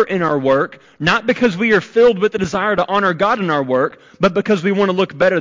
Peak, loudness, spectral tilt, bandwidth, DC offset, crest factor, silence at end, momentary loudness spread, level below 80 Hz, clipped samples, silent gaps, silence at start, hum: -4 dBFS; -16 LUFS; -6 dB/octave; 7.6 kHz; 0.1%; 12 dB; 0 s; 5 LU; -52 dBFS; under 0.1%; none; 0 s; none